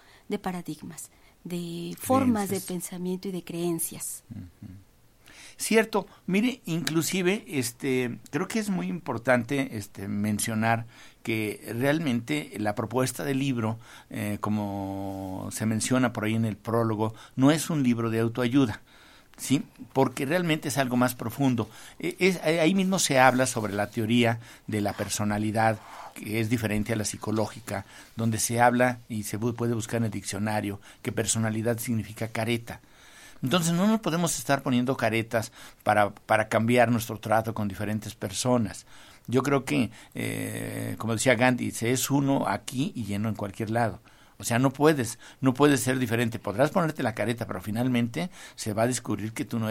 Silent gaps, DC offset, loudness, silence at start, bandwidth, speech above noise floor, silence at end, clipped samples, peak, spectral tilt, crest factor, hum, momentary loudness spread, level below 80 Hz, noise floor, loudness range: none; under 0.1%; -27 LUFS; 0.3 s; 16.5 kHz; 28 dB; 0 s; under 0.1%; -4 dBFS; -5 dB/octave; 24 dB; none; 12 LU; -58 dBFS; -55 dBFS; 5 LU